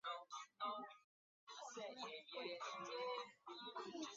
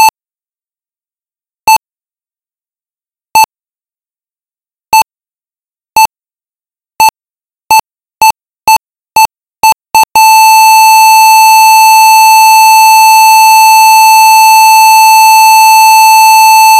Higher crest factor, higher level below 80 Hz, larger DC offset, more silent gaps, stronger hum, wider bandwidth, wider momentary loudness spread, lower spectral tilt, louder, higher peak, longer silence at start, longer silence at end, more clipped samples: first, 18 dB vs 6 dB; second, under -90 dBFS vs -50 dBFS; neither; first, 1.04-1.47 s vs none; neither; second, 7.4 kHz vs 16.5 kHz; about the same, 10 LU vs 8 LU; first, -0.5 dB/octave vs 2.5 dB/octave; second, -51 LUFS vs -3 LUFS; second, -34 dBFS vs 0 dBFS; about the same, 0.05 s vs 0 s; about the same, 0 s vs 0 s; second, under 0.1% vs 0.8%